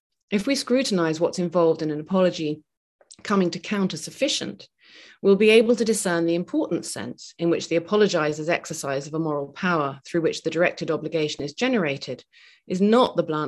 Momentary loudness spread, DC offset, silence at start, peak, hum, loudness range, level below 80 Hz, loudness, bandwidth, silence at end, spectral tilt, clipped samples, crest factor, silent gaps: 10 LU; under 0.1%; 0.3 s; -4 dBFS; none; 4 LU; -66 dBFS; -23 LUFS; 12.5 kHz; 0 s; -5 dB/octave; under 0.1%; 20 dB; 2.77-2.99 s